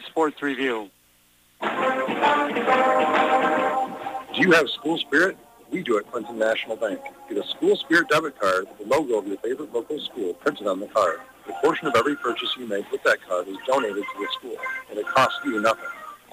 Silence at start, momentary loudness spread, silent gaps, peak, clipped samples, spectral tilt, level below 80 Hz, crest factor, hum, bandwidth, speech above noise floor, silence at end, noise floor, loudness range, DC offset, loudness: 0 s; 12 LU; none; -6 dBFS; under 0.1%; -4 dB/octave; -66 dBFS; 18 dB; none; 15.5 kHz; 36 dB; 0.15 s; -59 dBFS; 4 LU; under 0.1%; -23 LUFS